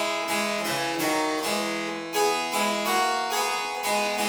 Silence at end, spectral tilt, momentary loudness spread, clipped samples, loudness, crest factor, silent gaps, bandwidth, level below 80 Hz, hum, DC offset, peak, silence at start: 0 s; -2 dB/octave; 3 LU; under 0.1%; -25 LUFS; 14 dB; none; over 20 kHz; -68 dBFS; none; under 0.1%; -12 dBFS; 0 s